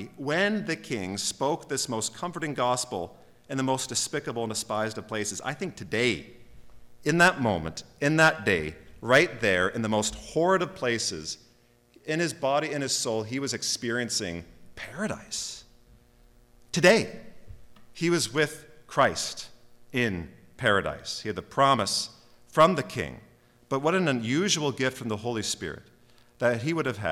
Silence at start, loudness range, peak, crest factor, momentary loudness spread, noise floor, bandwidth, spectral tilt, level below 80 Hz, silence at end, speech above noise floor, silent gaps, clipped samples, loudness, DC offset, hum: 0 s; 5 LU; -8 dBFS; 20 dB; 14 LU; -61 dBFS; 17.5 kHz; -3.5 dB/octave; -56 dBFS; 0 s; 34 dB; none; under 0.1%; -27 LUFS; under 0.1%; none